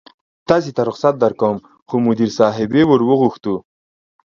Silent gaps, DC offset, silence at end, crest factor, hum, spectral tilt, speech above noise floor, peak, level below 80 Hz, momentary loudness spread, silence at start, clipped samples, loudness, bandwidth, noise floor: 1.82-1.86 s; under 0.1%; 0.7 s; 16 dB; none; -7 dB/octave; over 75 dB; 0 dBFS; -54 dBFS; 11 LU; 0.5 s; under 0.1%; -16 LUFS; 7.4 kHz; under -90 dBFS